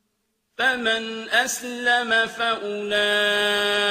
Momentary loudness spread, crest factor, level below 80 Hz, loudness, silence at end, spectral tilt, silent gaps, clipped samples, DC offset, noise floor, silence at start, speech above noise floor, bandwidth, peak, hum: 5 LU; 18 dB; -66 dBFS; -21 LUFS; 0 s; -1 dB/octave; none; under 0.1%; under 0.1%; -73 dBFS; 0.6 s; 51 dB; 15.5 kHz; -6 dBFS; none